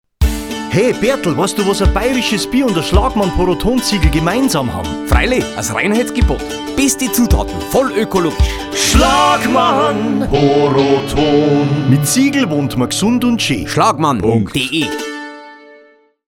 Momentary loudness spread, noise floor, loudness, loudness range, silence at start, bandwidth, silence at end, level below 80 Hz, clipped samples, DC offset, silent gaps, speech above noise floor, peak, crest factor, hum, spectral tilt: 6 LU; -47 dBFS; -14 LUFS; 3 LU; 0.2 s; 18 kHz; 0.75 s; -22 dBFS; under 0.1%; under 0.1%; none; 34 dB; 0 dBFS; 14 dB; none; -4.5 dB/octave